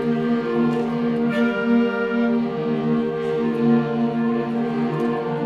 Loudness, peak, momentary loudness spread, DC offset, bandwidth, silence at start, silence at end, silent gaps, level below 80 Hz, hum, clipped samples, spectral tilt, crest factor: -21 LUFS; -6 dBFS; 4 LU; under 0.1%; 5.8 kHz; 0 s; 0 s; none; -58 dBFS; none; under 0.1%; -8.5 dB/octave; 14 dB